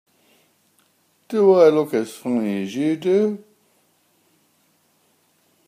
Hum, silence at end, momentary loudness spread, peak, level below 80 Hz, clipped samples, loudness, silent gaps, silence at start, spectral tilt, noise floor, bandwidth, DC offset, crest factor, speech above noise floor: none; 2.3 s; 11 LU; -2 dBFS; -76 dBFS; under 0.1%; -19 LUFS; none; 1.3 s; -7 dB/octave; -63 dBFS; 15.5 kHz; under 0.1%; 20 dB; 45 dB